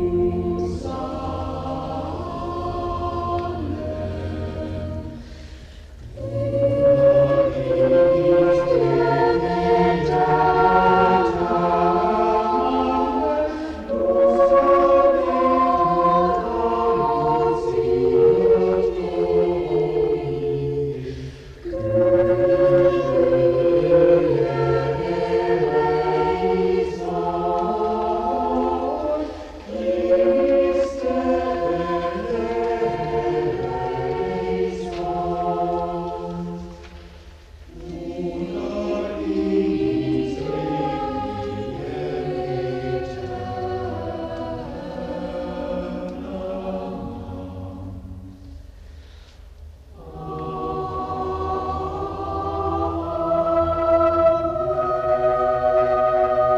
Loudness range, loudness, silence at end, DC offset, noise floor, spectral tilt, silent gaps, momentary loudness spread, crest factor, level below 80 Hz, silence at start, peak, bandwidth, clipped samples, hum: 12 LU; -21 LUFS; 0 s; under 0.1%; -43 dBFS; -8 dB/octave; none; 14 LU; 16 dB; -40 dBFS; 0 s; -4 dBFS; 8.2 kHz; under 0.1%; none